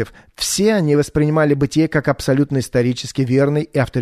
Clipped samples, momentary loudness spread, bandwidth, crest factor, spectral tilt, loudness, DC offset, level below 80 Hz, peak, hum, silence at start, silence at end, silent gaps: under 0.1%; 5 LU; 13.5 kHz; 14 dB; -5.5 dB/octave; -17 LUFS; under 0.1%; -42 dBFS; -4 dBFS; none; 0 s; 0 s; none